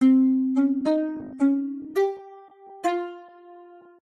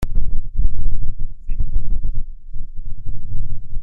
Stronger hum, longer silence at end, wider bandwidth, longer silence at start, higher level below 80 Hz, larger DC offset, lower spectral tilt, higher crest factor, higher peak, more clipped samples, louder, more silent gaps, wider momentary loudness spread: neither; first, 0.45 s vs 0 s; first, 7.6 kHz vs 0.7 kHz; about the same, 0 s vs 0 s; second, -70 dBFS vs -20 dBFS; neither; second, -6 dB/octave vs -8.5 dB/octave; about the same, 14 dB vs 10 dB; second, -10 dBFS vs -2 dBFS; neither; first, -24 LUFS vs -30 LUFS; neither; about the same, 12 LU vs 10 LU